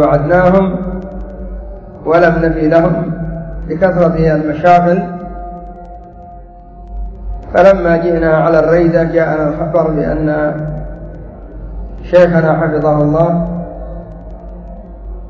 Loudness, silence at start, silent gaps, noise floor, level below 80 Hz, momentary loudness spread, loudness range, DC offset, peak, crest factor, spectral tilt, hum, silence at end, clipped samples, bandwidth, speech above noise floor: -12 LUFS; 0 s; none; -33 dBFS; -28 dBFS; 22 LU; 4 LU; under 0.1%; 0 dBFS; 12 dB; -9.5 dB/octave; none; 0 s; 0.2%; 7.2 kHz; 23 dB